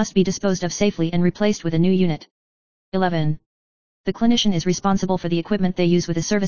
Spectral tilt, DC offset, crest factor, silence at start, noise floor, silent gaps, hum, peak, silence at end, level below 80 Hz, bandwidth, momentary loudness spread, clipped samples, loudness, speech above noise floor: -5.5 dB/octave; 2%; 16 dB; 0 s; under -90 dBFS; 2.31-2.92 s, 3.46-4.04 s; none; -4 dBFS; 0 s; -48 dBFS; 7.2 kHz; 7 LU; under 0.1%; -21 LUFS; over 70 dB